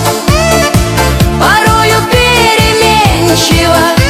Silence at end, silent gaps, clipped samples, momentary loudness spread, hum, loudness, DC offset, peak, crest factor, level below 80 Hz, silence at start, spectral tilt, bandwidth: 0 s; none; 0.9%; 3 LU; none; -7 LUFS; under 0.1%; 0 dBFS; 8 dB; -18 dBFS; 0 s; -4 dB/octave; over 20 kHz